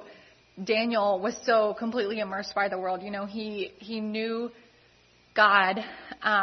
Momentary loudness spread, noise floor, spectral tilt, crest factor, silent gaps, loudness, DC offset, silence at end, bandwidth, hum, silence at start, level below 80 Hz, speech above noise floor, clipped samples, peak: 13 LU; -60 dBFS; -4 dB/octave; 22 dB; none; -27 LUFS; under 0.1%; 0 s; 6.4 kHz; none; 0 s; -70 dBFS; 33 dB; under 0.1%; -6 dBFS